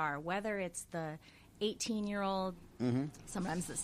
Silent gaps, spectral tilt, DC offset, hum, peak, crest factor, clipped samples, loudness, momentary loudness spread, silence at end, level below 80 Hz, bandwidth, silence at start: none; -4.5 dB/octave; under 0.1%; none; -24 dBFS; 16 dB; under 0.1%; -38 LUFS; 7 LU; 0 s; -62 dBFS; 15.5 kHz; 0 s